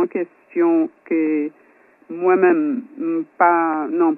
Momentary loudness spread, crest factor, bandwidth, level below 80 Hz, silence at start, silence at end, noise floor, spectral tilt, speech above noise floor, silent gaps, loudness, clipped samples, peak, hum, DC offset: 10 LU; 18 dB; 2.9 kHz; -80 dBFS; 0 s; 0 s; -52 dBFS; -10.5 dB/octave; 33 dB; none; -19 LUFS; under 0.1%; -2 dBFS; none; under 0.1%